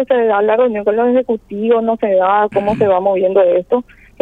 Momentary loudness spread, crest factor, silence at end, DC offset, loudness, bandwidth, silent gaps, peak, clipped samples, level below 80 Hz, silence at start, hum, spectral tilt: 5 LU; 12 dB; 0.4 s; under 0.1%; -14 LUFS; 4.5 kHz; none; -2 dBFS; under 0.1%; -48 dBFS; 0 s; none; -8.5 dB/octave